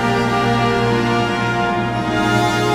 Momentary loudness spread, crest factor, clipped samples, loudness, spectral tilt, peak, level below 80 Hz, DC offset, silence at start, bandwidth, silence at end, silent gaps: 3 LU; 12 dB; under 0.1%; -17 LUFS; -5.5 dB/octave; -4 dBFS; -38 dBFS; under 0.1%; 0 s; 16 kHz; 0 s; none